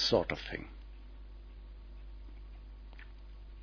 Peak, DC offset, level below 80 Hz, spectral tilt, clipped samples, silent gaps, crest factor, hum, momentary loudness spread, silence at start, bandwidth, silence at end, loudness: -14 dBFS; under 0.1%; -48 dBFS; -3 dB/octave; under 0.1%; none; 26 dB; none; 18 LU; 0 s; 5.4 kHz; 0 s; -35 LUFS